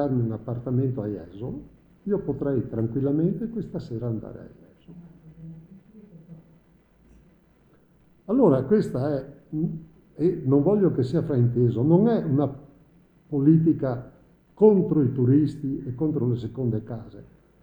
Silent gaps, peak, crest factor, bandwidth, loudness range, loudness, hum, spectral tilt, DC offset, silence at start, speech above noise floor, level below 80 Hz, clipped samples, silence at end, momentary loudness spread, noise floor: none; -4 dBFS; 20 dB; 19.5 kHz; 8 LU; -24 LUFS; none; -11 dB/octave; under 0.1%; 0 s; 36 dB; -54 dBFS; under 0.1%; 0.4 s; 17 LU; -59 dBFS